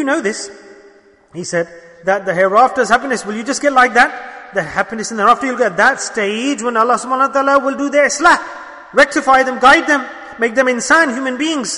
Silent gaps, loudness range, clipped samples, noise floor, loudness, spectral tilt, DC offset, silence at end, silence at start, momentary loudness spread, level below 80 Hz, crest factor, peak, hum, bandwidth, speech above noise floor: none; 3 LU; under 0.1%; -46 dBFS; -14 LUFS; -3 dB/octave; under 0.1%; 0 s; 0 s; 11 LU; -50 dBFS; 14 dB; 0 dBFS; none; 11 kHz; 32 dB